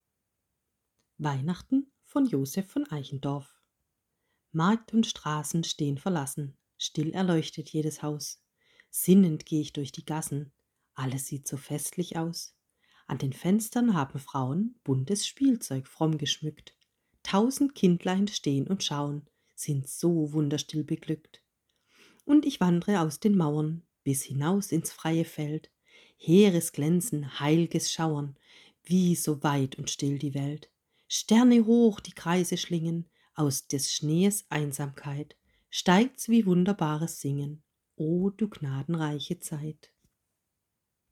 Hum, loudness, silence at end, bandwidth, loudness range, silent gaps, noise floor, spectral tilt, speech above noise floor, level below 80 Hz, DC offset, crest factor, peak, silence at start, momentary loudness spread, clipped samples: none; -28 LUFS; 1.4 s; 17 kHz; 6 LU; none; -83 dBFS; -5.5 dB/octave; 55 dB; -68 dBFS; under 0.1%; 20 dB; -8 dBFS; 1.2 s; 13 LU; under 0.1%